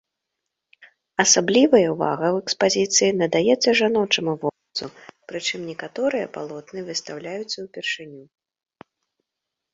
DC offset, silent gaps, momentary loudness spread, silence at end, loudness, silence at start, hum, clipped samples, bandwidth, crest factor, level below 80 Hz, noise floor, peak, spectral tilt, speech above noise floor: under 0.1%; none; 16 LU; 1.5 s; -21 LUFS; 0.8 s; none; under 0.1%; 8 kHz; 22 dB; -66 dBFS; -84 dBFS; -2 dBFS; -2.5 dB/octave; 62 dB